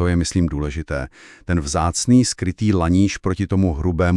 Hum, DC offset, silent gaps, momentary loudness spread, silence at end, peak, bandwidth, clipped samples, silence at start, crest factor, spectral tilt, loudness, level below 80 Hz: none; under 0.1%; none; 11 LU; 0 s; -4 dBFS; 12 kHz; under 0.1%; 0 s; 14 dB; -5.5 dB/octave; -19 LUFS; -34 dBFS